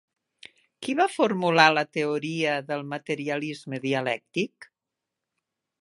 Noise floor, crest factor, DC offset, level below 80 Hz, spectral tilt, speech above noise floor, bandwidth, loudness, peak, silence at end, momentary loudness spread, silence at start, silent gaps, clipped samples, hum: -86 dBFS; 26 dB; under 0.1%; -78 dBFS; -5 dB/octave; 61 dB; 11.5 kHz; -25 LUFS; -2 dBFS; 1.2 s; 13 LU; 0.8 s; none; under 0.1%; none